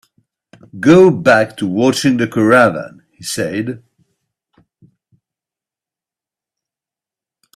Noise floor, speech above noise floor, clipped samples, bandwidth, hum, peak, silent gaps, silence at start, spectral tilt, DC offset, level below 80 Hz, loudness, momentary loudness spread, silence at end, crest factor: -89 dBFS; 76 dB; under 0.1%; 14 kHz; none; 0 dBFS; none; 0.75 s; -5.5 dB/octave; under 0.1%; -56 dBFS; -13 LUFS; 18 LU; 3.8 s; 16 dB